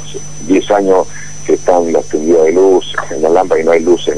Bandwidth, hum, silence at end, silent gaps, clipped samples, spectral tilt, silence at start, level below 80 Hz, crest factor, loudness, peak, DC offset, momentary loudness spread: 10.5 kHz; 50 Hz at -40 dBFS; 0 s; none; 0.2%; -4.5 dB/octave; 0 s; -44 dBFS; 12 dB; -11 LUFS; 0 dBFS; 7%; 11 LU